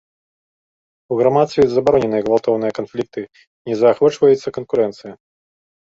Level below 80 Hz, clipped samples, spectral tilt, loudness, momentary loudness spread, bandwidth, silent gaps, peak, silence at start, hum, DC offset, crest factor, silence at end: -54 dBFS; under 0.1%; -7 dB/octave; -17 LUFS; 14 LU; 7.8 kHz; 3.47-3.65 s; 0 dBFS; 1.1 s; none; under 0.1%; 18 dB; 0.8 s